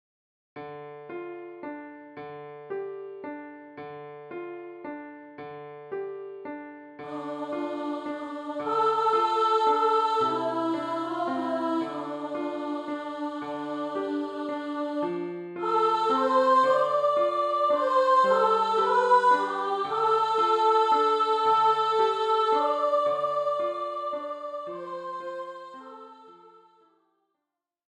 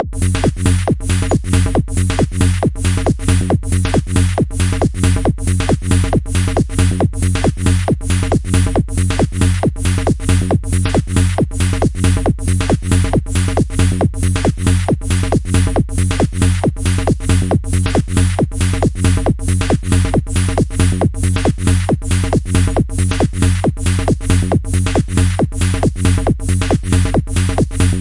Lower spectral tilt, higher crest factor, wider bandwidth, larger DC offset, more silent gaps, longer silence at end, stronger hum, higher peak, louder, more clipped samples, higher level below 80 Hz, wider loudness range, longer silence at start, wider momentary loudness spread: about the same, -5 dB/octave vs -6 dB/octave; about the same, 18 dB vs 14 dB; about the same, 11 kHz vs 11.5 kHz; neither; neither; first, 1.4 s vs 0 s; neither; second, -10 dBFS vs 0 dBFS; second, -26 LUFS vs -16 LUFS; neither; second, -76 dBFS vs -22 dBFS; first, 17 LU vs 0 LU; first, 0.55 s vs 0 s; first, 20 LU vs 2 LU